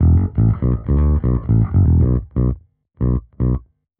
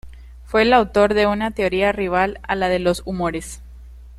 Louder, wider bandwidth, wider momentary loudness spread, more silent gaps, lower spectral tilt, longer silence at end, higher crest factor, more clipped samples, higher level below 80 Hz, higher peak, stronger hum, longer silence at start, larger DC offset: about the same, -18 LUFS vs -19 LUFS; second, 2.3 kHz vs 13 kHz; second, 7 LU vs 10 LU; neither; first, -13.5 dB/octave vs -5 dB/octave; first, 0.4 s vs 0.05 s; second, 12 dB vs 18 dB; neither; first, -22 dBFS vs -38 dBFS; about the same, -4 dBFS vs -2 dBFS; neither; about the same, 0 s vs 0.05 s; neither